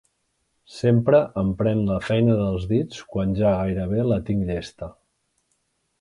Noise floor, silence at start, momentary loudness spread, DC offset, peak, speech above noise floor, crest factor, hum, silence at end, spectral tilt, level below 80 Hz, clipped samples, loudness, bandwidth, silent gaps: -72 dBFS; 0.7 s; 11 LU; under 0.1%; -6 dBFS; 51 dB; 18 dB; none; 1.1 s; -8.5 dB/octave; -42 dBFS; under 0.1%; -22 LUFS; 11 kHz; none